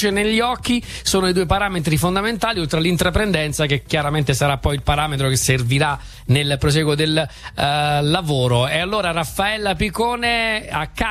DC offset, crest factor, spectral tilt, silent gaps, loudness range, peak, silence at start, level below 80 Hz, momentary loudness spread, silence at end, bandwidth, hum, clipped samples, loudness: under 0.1%; 16 dB; -4.5 dB/octave; none; 1 LU; -2 dBFS; 0 s; -34 dBFS; 4 LU; 0 s; 15 kHz; none; under 0.1%; -19 LUFS